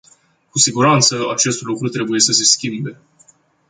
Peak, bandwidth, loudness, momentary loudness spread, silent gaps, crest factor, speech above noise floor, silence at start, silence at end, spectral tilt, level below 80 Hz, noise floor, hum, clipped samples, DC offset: 0 dBFS; 11 kHz; -14 LUFS; 12 LU; none; 18 dB; 37 dB; 0.55 s; 0.75 s; -2.5 dB/octave; -58 dBFS; -53 dBFS; none; under 0.1%; under 0.1%